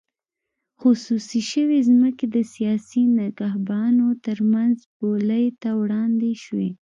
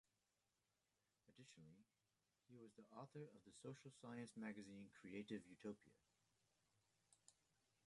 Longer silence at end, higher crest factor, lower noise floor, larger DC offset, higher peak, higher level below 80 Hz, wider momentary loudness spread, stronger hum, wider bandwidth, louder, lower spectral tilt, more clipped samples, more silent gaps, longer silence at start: second, 0.1 s vs 0.55 s; second, 14 dB vs 22 dB; second, -83 dBFS vs under -90 dBFS; neither; first, -8 dBFS vs -40 dBFS; first, -70 dBFS vs under -90 dBFS; second, 7 LU vs 12 LU; neither; second, 7.6 kHz vs 11 kHz; first, -21 LUFS vs -59 LUFS; about the same, -6.5 dB/octave vs -5.5 dB/octave; neither; first, 4.86-5.00 s vs none; second, 0.8 s vs 1.25 s